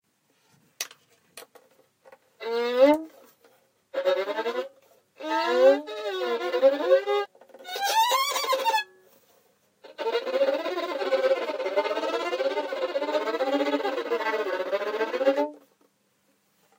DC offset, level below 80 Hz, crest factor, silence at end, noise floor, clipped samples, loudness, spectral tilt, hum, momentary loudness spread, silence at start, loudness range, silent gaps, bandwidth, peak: under 0.1%; -80 dBFS; 20 dB; 1.2 s; -69 dBFS; under 0.1%; -26 LUFS; -1 dB/octave; none; 15 LU; 0.8 s; 4 LU; none; 16 kHz; -8 dBFS